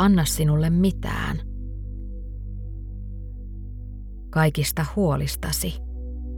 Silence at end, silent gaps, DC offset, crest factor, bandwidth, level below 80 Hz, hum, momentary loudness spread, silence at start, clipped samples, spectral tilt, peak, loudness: 0 s; none; under 0.1%; 18 dB; 18.5 kHz; -32 dBFS; none; 17 LU; 0 s; under 0.1%; -5.5 dB/octave; -8 dBFS; -24 LUFS